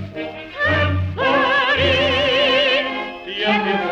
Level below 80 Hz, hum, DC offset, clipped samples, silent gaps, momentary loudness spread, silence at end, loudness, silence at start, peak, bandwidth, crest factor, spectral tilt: -44 dBFS; none; under 0.1%; under 0.1%; none; 12 LU; 0 s; -17 LUFS; 0 s; -6 dBFS; 8.6 kHz; 12 dB; -5.5 dB/octave